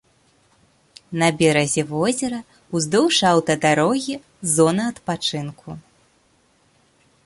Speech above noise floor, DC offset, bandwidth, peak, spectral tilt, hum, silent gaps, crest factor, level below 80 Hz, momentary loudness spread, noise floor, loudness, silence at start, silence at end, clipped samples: 41 dB; under 0.1%; 12 kHz; -4 dBFS; -4 dB/octave; none; none; 18 dB; -58 dBFS; 15 LU; -60 dBFS; -20 LUFS; 1.1 s; 1.45 s; under 0.1%